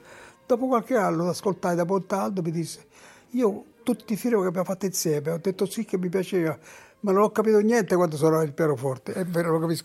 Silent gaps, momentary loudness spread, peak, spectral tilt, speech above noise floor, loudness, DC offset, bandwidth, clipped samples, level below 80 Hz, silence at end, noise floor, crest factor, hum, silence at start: none; 8 LU; -8 dBFS; -6 dB/octave; 24 dB; -25 LUFS; under 0.1%; 16 kHz; under 0.1%; -70 dBFS; 0 s; -48 dBFS; 16 dB; none; 0.1 s